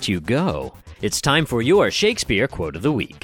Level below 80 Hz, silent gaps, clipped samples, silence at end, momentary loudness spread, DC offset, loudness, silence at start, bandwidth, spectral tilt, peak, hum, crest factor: -42 dBFS; none; under 0.1%; 0.05 s; 9 LU; under 0.1%; -20 LUFS; 0 s; 17.5 kHz; -4.5 dB/octave; -4 dBFS; none; 16 dB